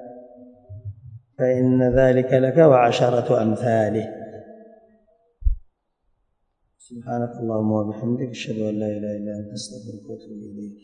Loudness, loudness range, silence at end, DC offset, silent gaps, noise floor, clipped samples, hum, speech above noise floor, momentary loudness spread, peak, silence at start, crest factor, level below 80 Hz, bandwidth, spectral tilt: -21 LUFS; 13 LU; 0.1 s; under 0.1%; none; -70 dBFS; under 0.1%; none; 50 dB; 22 LU; -2 dBFS; 0 s; 20 dB; -38 dBFS; 10 kHz; -7.5 dB/octave